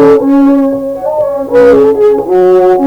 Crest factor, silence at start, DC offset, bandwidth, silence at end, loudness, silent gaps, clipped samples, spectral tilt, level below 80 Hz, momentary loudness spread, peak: 6 dB; 0 s; under 0.1%; 8.8 kHz; 0 s; -8 LUFS; none; 0.4%; -7.5 dB/octave; -40 dBFS; 7 LU; 0 dBFS